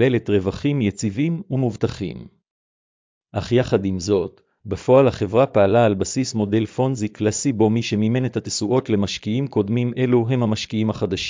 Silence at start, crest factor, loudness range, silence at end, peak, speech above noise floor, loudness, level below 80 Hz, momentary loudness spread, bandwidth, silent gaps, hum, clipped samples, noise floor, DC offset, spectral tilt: 0 s; 16 dB; 5 LU; 0 s; -4 dBFS; over 70 dB; -20 LUFS; -46 dBFS; 8 LU; 7.6 kHz; 2.51-3.21 s; none; under 0.1%; under -90 dBFS; under 0.1%; -6 dB/octave